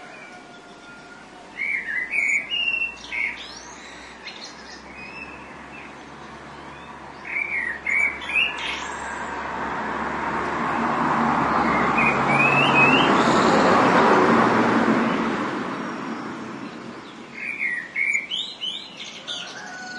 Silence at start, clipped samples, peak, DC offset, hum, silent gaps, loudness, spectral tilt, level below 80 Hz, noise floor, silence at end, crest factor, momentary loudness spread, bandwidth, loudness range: 0 s; under 0.1%; -4 dBFS; under 0.1%; none; none; -21 LUFS; -4.5 dB/octave; -54 dBFS; -43 dBFS; 0 s; 20 dB; 22 LU; 11.5 kHz; 15 LU